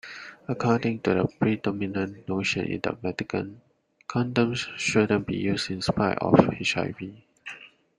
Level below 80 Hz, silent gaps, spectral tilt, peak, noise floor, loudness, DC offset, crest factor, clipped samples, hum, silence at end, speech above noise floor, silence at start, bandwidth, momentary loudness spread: -56 dBFS; none; -5.5 dB/octave; -2 dBFS; -46 dBFS; -26 LUFS; under 0.1%; 24 dB; under 0.1%; none; 0.3 s; 20 dB; 0.05 s; 11 kHz; 18 LU